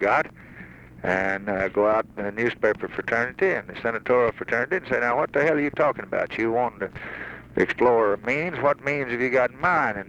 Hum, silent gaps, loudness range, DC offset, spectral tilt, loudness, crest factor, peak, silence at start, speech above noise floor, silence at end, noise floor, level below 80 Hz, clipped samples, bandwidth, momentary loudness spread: none; none; 1 LU; under 0.1%; -6.5 dB/octave; -24 LUFS; 18 dB; -6 dBFS; 0 s; 20 dB; 0 s; -44 dBFS; -54 dBFS; under 0.1%; 8.8 kHz; 11 LU